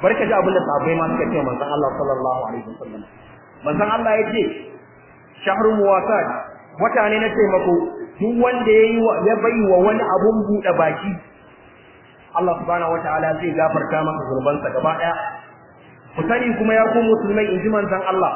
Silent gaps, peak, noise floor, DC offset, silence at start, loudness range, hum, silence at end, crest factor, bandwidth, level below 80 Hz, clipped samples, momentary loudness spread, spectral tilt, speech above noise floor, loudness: none; -4 dBFS; -46 dBFS; under 0.1%; 0 s; 6 LU; none; 0 s; 16 dB; 3.2 kHz; -52 dBFS; under 0.1%; 11 LU; -10 dB/octave; 28 dB; -19 LUFS